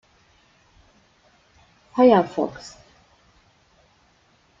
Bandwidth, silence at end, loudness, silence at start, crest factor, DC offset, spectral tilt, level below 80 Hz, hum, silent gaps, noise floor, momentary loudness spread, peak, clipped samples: 7.6 kHz; 1.9 s; -19 LUFS; 1.95 s; 22 dB; under 0.1%; -6.5 dB/octave; -62 dBFS; none; none; -60 dBFS; 25 LU; -4 dBFS; under 0.1%